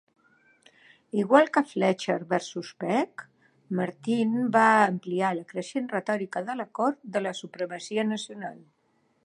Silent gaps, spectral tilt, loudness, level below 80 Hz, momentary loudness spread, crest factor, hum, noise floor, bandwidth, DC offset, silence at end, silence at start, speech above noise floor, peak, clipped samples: none; -5.5 dB/octave; -27 LUFS; -82 dBFS; 14 LU; 22 dB; none; -69 dBFS; 11 kHz; under 0.1%; 0.7 s; 1.15 s; 43 dB; -4 dBFS; under 0.1%